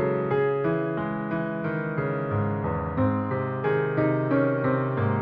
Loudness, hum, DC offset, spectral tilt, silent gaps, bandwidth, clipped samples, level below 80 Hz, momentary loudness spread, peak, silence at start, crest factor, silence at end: -26 LUFS; none; under 0.1%; -8 dB/octave; none; 4.9 kHz; under 0.1%; -50 dBFS; 5 LU; -10 dBFS; 0 s; 14 dB; 0 s